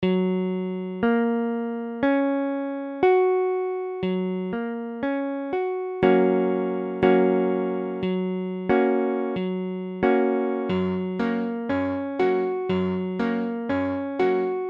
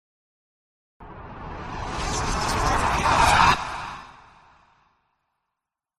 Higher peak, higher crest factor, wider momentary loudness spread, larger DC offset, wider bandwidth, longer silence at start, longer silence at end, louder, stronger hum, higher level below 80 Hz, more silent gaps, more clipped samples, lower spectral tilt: about the same, -6 dBFS vs -4 dBFS; about the same, 18 dB vs 22 dB; second, 8 LU vs 22 LU; neither; second, 5.4 kHz vs 14.5 kHz; second, 0 s vs 1 s; second, 0 s vs 1.85 s; about the same, -24 LUFS vs -22 LUFS; neither; second, -60 dBFS vs -36 dBFS; neither; neither; first, -9.5 dB/octave vs -3.5 dB/octave